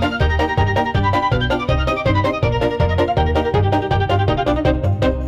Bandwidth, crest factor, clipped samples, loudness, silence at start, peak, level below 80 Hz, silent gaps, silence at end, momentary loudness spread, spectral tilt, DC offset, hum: 8 kHz; 10 dB; under 0.1%; -17 LUFS; 0 s; -6 dBFS; -26 dBFS; none; 0 s; 1 LU; -7.5 dB/octave; under 0.1%; none